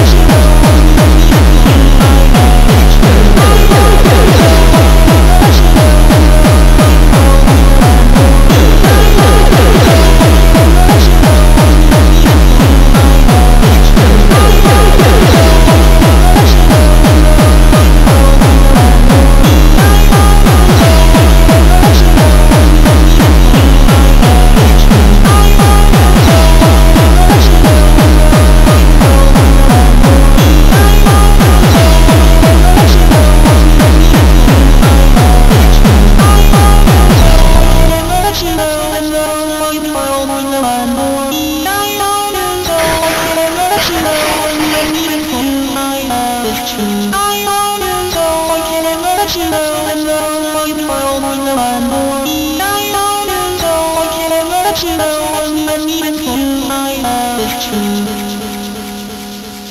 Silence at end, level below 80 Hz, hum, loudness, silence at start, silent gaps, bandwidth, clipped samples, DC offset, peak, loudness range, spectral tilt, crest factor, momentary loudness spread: 0 s; -8 dBFS; none; -8 LUFS; 0 s; none; 16.5 kHz; 2%; 1%; 0 dBFS; 7 LU; -5.5 dB/octave; 6 dB; 8 LU